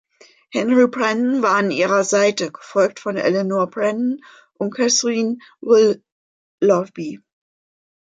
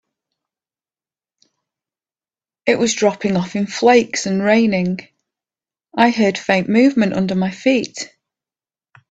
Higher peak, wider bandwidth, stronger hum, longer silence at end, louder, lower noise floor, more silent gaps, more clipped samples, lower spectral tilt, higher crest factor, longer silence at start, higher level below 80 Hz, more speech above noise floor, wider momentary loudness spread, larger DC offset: second, -4 dBFS vs 0 dBFS; about the same, 9.4 kHz vs 8.8 kHz; neither; second, 0.85 s vs 1.05 s; about the same, -18 LUFS vs -16 LUFS; second, -49 dBFS vs under -90 dBFS; first, 6.12-6.58 s vs none; neither; about the same, -4 dB/octave vs -5 dB/octave; about the same, 16 dB vs 18 dB; second, 0.55 s vs 2.65 s; second, -70 dBFS vs -58 dBFS; second, 31 dB vs over 74 dB; about the same, 12 LU vs 10 LU; neither